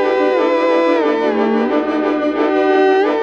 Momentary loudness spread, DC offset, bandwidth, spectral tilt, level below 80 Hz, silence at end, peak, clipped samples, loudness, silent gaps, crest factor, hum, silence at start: 4 LU; under 0.1%; 7.4 kHz; -5.5 dB/octave; -52 dBFS; 0 s; -4 dBFS; under 0.1%; -15 LUFS; none; 10 dB; 60 Hz at -45 dBFS; 0 s